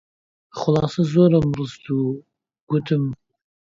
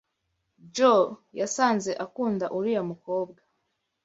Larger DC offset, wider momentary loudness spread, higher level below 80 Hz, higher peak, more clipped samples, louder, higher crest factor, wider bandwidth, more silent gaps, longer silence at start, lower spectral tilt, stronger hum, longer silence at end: neither; about the same, 14 LU vs 12 LU; first, -50 dBFS vs -72 dBFS; about the same, -4 dBFS vs -6 dBFS; neither; first, -21 LUFS vs -26 LUFS; about the same, 18 dB vs 20 dB; about the same, 7.6 kHz vs 8 kHz; first, 2.61-2.67 s vs none; about the same, 0.55 s vs 0.65 s; first, -8.5 dB/octave vs -4.5 dB/octave; neither; second, 0.5 s vs 0.75 s